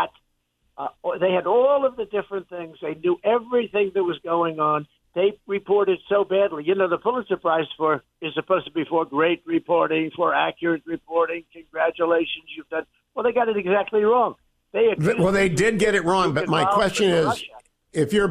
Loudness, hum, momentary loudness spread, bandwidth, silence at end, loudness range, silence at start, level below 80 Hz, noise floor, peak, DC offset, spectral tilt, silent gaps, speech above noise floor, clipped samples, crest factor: -22 LUFS; none; 11 LU; 14.5 kHz; 0 s; 4 LU; 0 s; -54 dBFS; -70 dBFS; -6 dBFS; under 0.1%; -5.5 dB/octave; none; 48 dB; under 0.1%; 16 dB